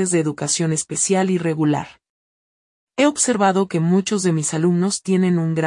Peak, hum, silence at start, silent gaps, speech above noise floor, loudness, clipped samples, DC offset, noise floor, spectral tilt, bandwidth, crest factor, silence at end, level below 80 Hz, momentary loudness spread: -4 dBFS; none; 0 s; 2.10-2.87 s; over 72 dB; -19 LUFS; under 0.1%; under 0.1%; under -90 dBFS; -5 dB/octave; 11 kHz; 16 dB; 0 s; -64 dBFS; 4 LU